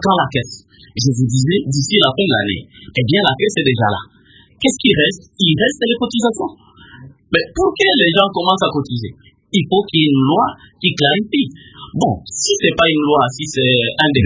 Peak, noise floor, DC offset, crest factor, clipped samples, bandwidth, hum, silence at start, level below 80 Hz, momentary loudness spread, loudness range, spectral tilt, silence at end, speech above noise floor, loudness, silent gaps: 0 dBFS; -40 dBFS; under 0.1%; 16 dB; under 0.1%; 8 kHz; none; 0 s; -44 dBFS; 10 LU; 2 LU; -4.5 dB/octave; 0 s; 24 dB; -15 LUFS; none